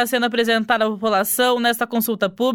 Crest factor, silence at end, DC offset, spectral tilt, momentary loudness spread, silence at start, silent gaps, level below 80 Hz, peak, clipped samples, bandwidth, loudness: 16 dB; 0 s; under 0.1%; -3 dB/octave; 4 LU; 0 s; none; -64 dBFS; -4 dBFS; under 0.1%; 18 kHz; -19 LUFS